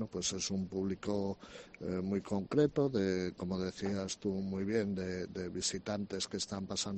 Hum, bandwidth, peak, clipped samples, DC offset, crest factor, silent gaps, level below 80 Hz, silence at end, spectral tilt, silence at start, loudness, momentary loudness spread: none; 8.8 kHz; -16 dBFS; under 0.1%; under 0.1%; 20 dB; none; -64 dBFS; 0 s; -4.5 dB/octave; 0 s; -36 LUFS; 8 LU